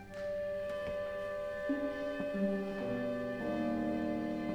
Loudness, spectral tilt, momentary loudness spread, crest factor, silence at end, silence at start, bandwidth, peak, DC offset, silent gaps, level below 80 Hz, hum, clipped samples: -37 LUFS; -7.5 dB/octave; 4 LU; 12 dB; 0 s; 0 s; 15 kHz; -24 dBFS; under 0.1%; none; -60 dBFS; none; under 0.1%